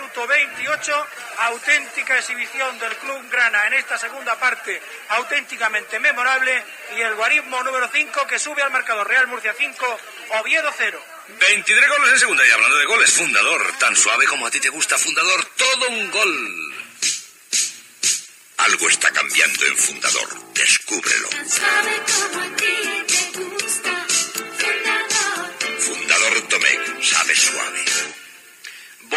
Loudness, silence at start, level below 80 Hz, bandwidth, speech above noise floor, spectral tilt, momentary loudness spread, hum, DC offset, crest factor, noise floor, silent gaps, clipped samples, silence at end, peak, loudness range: -17 LUFS; 0 s; -86 dBFS; 16 kHz; 21 dB; 1.5 dB/octave; 11 LU; none; under 0.1%; 20 dB; -40 dBFS; none; under 0.1%; 0 s; 0 dBFS; 6 LU